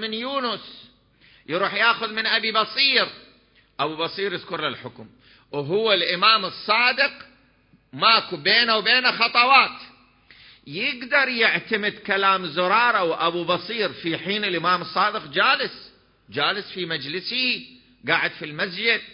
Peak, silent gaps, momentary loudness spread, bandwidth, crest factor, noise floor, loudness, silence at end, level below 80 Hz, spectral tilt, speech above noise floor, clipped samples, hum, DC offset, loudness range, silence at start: -2 dBFS; none; 11 LU; 5.6 kHz; 22 dB; -59 dBFS; -21 LUFS; 0 s; -66 dBFS; -7.5 dB/octave; 37 dB; under 0.1%; none; under 0.1%; 5 LU; 0 s